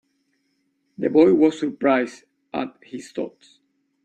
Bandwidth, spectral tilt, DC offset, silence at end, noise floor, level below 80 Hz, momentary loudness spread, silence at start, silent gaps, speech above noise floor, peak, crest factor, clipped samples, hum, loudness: 9.2 kHz; -6.5 dB/octave; under 0.1%; 0.75 s; -70 dBFS; -66 dBFS; 17 LU; 1 s; none; 50 dB; -4 dBFS; 18 dB; under 0.1%; none; -21 LUFS